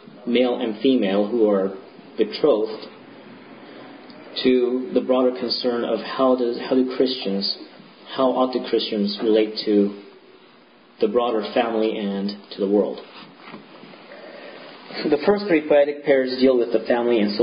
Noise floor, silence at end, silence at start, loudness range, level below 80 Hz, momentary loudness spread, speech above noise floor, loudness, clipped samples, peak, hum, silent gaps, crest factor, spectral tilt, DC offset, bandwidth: -51 dBFS; 0 s; 0.15 s; 4 LU; -66 dBFS; 22 LU; 31 dB; -21 LUFS; under 0.1%; -4 dBFS; none; none; 18 dB; -10 dB/octave; under 0.1%; 5.4 kHz